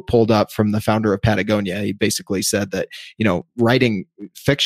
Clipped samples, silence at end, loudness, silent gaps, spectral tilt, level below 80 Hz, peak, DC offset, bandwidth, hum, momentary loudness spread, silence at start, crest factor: under 0.1%; 0 s; -19 LUFS; none; -5 dB/octave; -42 dBFS; -2 dBFS; under 0.1%; 15.5 kHz; none; 9 LU; 0.1 s; 16 dB